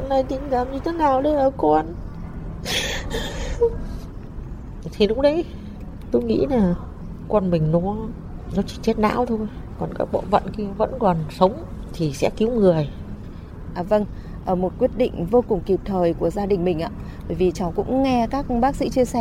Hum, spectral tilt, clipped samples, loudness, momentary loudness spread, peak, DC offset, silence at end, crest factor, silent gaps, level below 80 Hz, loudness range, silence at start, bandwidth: none; -6.5 dB/octave; under 0.1%; -22 LUFS; 16 LU; -2 dBFS; under 0.1%; 0 s; 20 dB; none; -36 dBFS; 2 LU; 0 s; 16 kHz